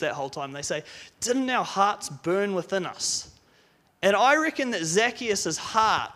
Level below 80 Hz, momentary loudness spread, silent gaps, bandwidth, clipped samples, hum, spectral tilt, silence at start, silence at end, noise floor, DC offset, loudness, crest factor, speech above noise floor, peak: -64 dBFS; 11 LU; none; 15.5 kHz; under 0.1%; none; -2.5 dB/octave; 0 s; 0.05 s; -62 dBFS; under 0.1%; -25 LUFS; 18 dB; 36 dB; -8 dBFS